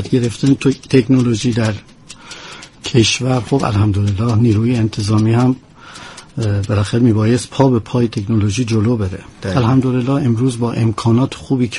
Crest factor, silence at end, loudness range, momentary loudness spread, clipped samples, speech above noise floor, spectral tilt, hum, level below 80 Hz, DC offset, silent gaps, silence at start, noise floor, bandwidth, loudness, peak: 14 dB; 0 s; 1 LU; 13 LU; under 0.1%; 21 dB; -6.5 dB/octave; none; -42 dBFS; under 0.1%; none; 0 s; -36 dBFS; 11.5 kHz; -15 LUFS; 0 dBFS